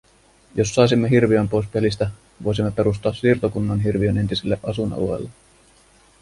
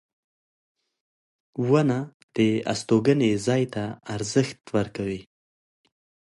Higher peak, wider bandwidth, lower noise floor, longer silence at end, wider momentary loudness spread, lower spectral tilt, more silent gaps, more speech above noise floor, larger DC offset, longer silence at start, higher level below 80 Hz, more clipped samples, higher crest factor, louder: first, -2 dBFS vs -6 dBFS; about the same, 11.5 kHz vs 11.5 kHz; second, -54 dBFS vs under -90 dBFS; second, 0.9 s vs 1.1 s; about the same, 10 LU vs 11 LU; about the same, -6.5 dB/octave vs -6 dB/octave; second, none vs 2.14-2.28 s; second, 35 dB vs over 67 dB; neither; second, 0.55 s vs 1.55 s; first, -42 dBFS vs -60 dBFS; neither; about the same, 18 dB vs 20 dB; first, -21 LUFS vs -25 LUFS